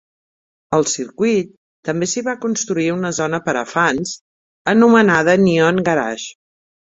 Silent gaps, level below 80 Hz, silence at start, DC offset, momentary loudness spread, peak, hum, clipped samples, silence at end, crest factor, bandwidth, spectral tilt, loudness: 1.57-1.83 s, 4.21-4.65 s; -56 dBFS; 0.7 s; under 0.1%; 14 LU; -2 dBFS; none; under 0.1%; 0.6 s; 16 dB; 8 kHz; -4.5 dB/octave; -17 LUFS